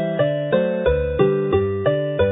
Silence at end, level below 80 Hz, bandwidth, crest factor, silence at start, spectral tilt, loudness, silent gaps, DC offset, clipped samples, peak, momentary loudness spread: 0 s; -34 dBFS; 3.9 kHz; 16 dB; 0 s; -12 dB/octave; -20 LUFS; none; under 0.1%; under 0.1%; -4 dBFS; 2 LU